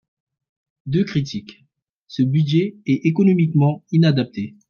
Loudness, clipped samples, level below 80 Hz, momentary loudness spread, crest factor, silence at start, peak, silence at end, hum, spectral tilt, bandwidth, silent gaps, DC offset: -19 LUFS; under 0.1%; -60 dBFS; 12 LU; 16 dB; 0.85 s; -4 dBFS; 0.2 s; none; -8.5 dB/octave; 6.8 kHz; 1.82-2.04 s; under 0.1%